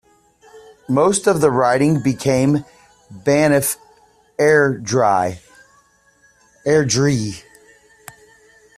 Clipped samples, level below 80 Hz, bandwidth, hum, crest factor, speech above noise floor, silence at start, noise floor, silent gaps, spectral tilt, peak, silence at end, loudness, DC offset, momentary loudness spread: under 0.1%; -54 dBFS; 15.5 kHz; none; 16 dB; 40 dB; 0.55 s; -56 dBFS; none; -5 dB/octave; -2 dBFS; 1.4 s; -17 LUFS; under 0.1%; 11 LU